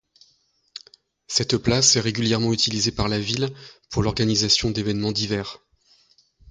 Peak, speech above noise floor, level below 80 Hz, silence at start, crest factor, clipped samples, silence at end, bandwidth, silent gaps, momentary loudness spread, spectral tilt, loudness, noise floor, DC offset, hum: -2 dBFS; 42 dB; -44 dBFS; 0.75 s; 22 dB; under 0.1%; 0.95 s; 9.6 kHz; none; 14 LU; -3.5 dB/octave; -21 LUFS; -64 dBFS; under 0.1%; none